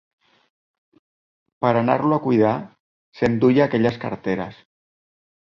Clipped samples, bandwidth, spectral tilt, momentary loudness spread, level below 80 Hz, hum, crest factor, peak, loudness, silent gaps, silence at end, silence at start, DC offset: under 0.1%; 7.2 kHz; -8.5 dB/octave; 11 LU; -56 dBFS; none; 20 dB; -4 dBFS; -20 LUFS; 2.80-3.12 s; 1.05 s; 1.6 s; under 0.1%